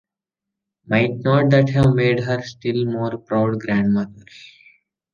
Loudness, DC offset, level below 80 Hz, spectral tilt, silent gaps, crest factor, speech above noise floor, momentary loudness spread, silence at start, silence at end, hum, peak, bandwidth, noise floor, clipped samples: -19 LUFS; under 0.1%; -50 dBFS; -8 dB/octave; none; 18 dB; 67 dB; 9 LU; 0.9 s; 0.95 s; none; -2 dBFS; 7.2 kHz; -85 dBFS; under 0.1%